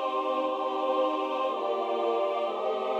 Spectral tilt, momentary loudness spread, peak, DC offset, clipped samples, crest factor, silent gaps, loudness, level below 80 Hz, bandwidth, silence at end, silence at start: -4 dB/octave; 2 LU; -16 dBFS; under 0.1%; under 0.1%; 12 dB; none; -29 LUFS; -84 dBFS; 8.4 kHz; 0 s; 0 s